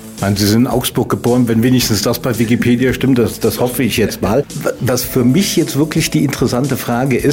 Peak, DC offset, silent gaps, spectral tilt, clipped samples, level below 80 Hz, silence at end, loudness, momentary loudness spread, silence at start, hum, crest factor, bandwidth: -2 dBFS; under 0.1%; none; -5 dB/octave; under 0.1%; -38 dBFS; 0 s; -14 LUFS; 4 LU; 0 s; none; 10 dB; 16.5 kHz